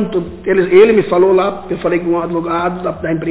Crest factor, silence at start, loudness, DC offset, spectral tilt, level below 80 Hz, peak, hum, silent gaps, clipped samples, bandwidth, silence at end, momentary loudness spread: 14 dB; 0 s; -13 LUFS; under 0.1%; -11 dB/octave; -42 dBFS; 0 dBFS; none; none; under 0.1%; 4 kHz; 0 s; 11 LU